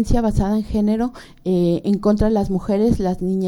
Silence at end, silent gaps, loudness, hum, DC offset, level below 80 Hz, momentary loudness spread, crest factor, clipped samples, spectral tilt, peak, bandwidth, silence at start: 0 s; none; -19 LUFS; none; under 0.1%; -30 dBFS; 5 LU; 16 dB; under 0.1%; -8.5 dB/octave; -2 dBFS; 12 kHz; 0 s